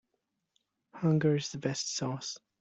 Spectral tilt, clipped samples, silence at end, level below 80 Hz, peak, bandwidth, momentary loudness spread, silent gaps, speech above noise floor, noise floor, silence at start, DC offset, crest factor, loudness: -5 dB/octave; under 0.1%; 0.25 s; -70 dBFS; -16 dBFS; 8.2 kHz; 10 LU; none; 52 dB; -82 dBFS; 0.95 s; under 0.1%; 18 dB; -32 LUFS